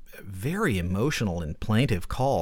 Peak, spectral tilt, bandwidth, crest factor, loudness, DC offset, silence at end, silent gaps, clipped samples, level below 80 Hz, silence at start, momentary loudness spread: -10 dBFS; -6 dB/octave; 17.5 kHz; 16 dB; -27 LUFS; under 0.1%; 0 s; none; under 0.1%; -40 dBFS; 0 s; 8 LU